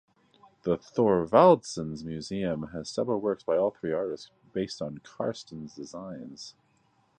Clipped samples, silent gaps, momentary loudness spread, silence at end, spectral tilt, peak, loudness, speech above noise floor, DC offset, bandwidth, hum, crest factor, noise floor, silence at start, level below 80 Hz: under 0.1%; none; 20 LU; 0.7 s; -6 dB/octave; -6 dBFS; -28 LUFS; 40 dB; under 0.1%; 9.6 kHz; none; 24 dB; -68 dBFS; 0.65 s; -60 dBFS